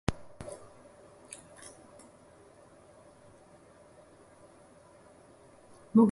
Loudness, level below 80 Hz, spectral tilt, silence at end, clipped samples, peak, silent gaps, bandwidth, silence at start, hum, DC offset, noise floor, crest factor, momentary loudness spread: -35 LUFS; -56 dBFS; -7 dB/octave; 0 s; under 0.1%; -10 dBFS; none; 11.5 kHz; 0.1 s; none; under 0.1%; -57 dBFS; 26 dB; 12 LU